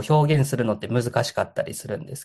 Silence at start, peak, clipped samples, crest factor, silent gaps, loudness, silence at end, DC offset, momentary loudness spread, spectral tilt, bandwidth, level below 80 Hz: 0 s; -4 dBFS; under 0.1%; 18 dB; none; -24 LUFS; 0 s; under 0.1%; 11 LU; -6 dB/octave; 12.5 kHz; -60 dBFS